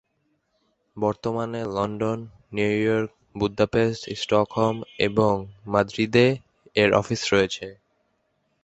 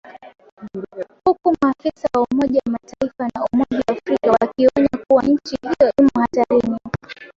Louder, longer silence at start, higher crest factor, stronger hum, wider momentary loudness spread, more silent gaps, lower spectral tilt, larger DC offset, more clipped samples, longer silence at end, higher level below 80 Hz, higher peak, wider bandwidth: second, -24 LUFS vs -18 LUFS; first, 0.95 s vs 0.05 s; first, 22 dB vs 16 dB; neither; second, 9 LU vs 13 LU; second, none vs 0.52-0.57 s; second, -5.5 dB/octave vs -7 dB/octave; neither; neither; first, 0.9 s vs 0.1 s; about the same, -52 dBFS vs -50 dBFS; about the same, -4 dBFS vs -2 dBFS; first, 8.2 kHz vs 7.4 kHz